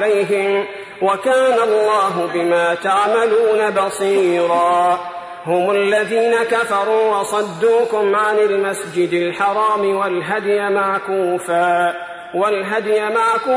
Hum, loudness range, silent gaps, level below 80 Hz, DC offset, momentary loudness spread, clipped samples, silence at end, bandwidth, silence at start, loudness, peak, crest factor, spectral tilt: none; 2 LU; none; -64 dBFS; under 0.1%; 5 LU; under 0.1%; 0 s; 11 kHz; 0 s; -16 LUFS; -4 dBFS; 12 dB; -4.5 dB/octave